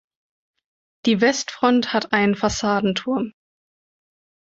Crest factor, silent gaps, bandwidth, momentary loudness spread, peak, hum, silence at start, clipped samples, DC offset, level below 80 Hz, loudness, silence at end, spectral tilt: 20 dB; none; 8 kHz; 7 LU; -2 dBFS; none; 1.05 s; under 0.1%; under 0.1%; -52 dBFS; -20 LUFS; 1.1 s; -4.5 dB/octave